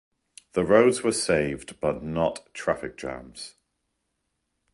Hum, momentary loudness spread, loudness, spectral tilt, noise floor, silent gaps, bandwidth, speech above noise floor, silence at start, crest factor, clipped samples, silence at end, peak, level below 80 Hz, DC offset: none; 18 LU; -25 LUFS; -4.5 dB/octave; -78 dBFS; none; 11.5 kHz; 53 dB; 0.55 s; 20 dB; under 0.1%; 1.25 s; -6 dBFS; -52 dBFS; under 0.1%